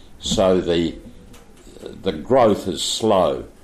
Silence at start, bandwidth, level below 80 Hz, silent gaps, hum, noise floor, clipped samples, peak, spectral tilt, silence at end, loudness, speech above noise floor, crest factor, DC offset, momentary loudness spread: 0.05 s; 15 kHz; -42 dBFS; none; none; -43 dBFS; under 0.1%; -6 dBFS; -4.5 dB/octave; 0.15 s; -19 LUFS; 24 dB; 16 dB; under 0.1%; 15 LU